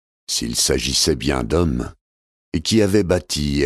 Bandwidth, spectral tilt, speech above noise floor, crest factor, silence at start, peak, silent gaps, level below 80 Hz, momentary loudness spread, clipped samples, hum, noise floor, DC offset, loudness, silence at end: 14.5 kHz; -4 dB/octave; over 71 dB; 16 dB; 0.3 s; -4 dBFS; 2.01-2.52 s; -34 dBFS; 8 LU; under 0.1%; none; under -90 dBFS; under 0.1%; -19 LUFS; 0 s